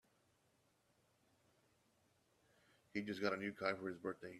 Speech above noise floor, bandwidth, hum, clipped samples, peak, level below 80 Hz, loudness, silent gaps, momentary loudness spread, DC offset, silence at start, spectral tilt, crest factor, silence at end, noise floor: 35 dB; 13.5 kHz; none; under 0.1%; -24 dBFS; -86 dBFS; -44 LUFS; none; 6 LU; under 0.1%; 2.95 s; -5.5 dB/octave; 24 dB; 0 s; -79 dBFS